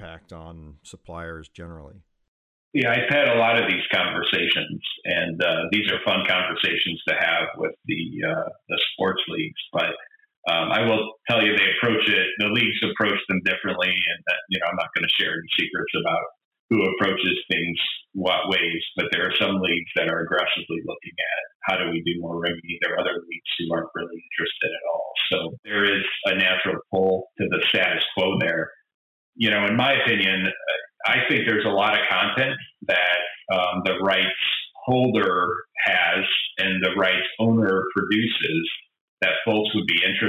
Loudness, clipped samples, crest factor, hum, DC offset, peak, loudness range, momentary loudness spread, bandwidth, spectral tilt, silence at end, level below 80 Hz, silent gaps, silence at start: -22 LUFS; under 0.1%; 14 dB; none; under 0.1%; -8 dBFS; 5 LU; 9 LU; 14.5 kHz; -6 dB/octave; 0 s; -58 dBFS; 2.28-2.72 s, 10.37-10.43 s, 16.45-16.51 s, 16.59-16.69 s, 21.55-21.60 s, 25.59-25.63 s, 28.94-29.33 s, 39.01-39.17 s; 0 s